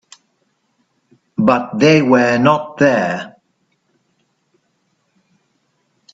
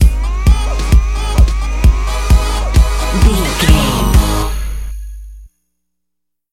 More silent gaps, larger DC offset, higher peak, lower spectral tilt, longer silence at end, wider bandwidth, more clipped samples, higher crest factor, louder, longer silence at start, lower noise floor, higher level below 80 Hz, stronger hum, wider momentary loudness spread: neither; second, under 0.1% vs 0.3%; about the same, 0 dBFS vs 0 dBFS; about the same, -6 dB/octave vs -5 dB/octave; first, 2.85 s vs 1.05 s; second, 8 kHz vs 15 kHz; neither; first, 18 dB vs 12 dB; about the same, -14 LUFS vs -14 LUFS; first, 1.4 s vs 0 s; second, -65 dBFS vs -79 dBFS; second, -60 dBFS vs -14 dBFS; second, none vs 60 Hz at -30 dBFS; about the same, 14 LU vs 12 LU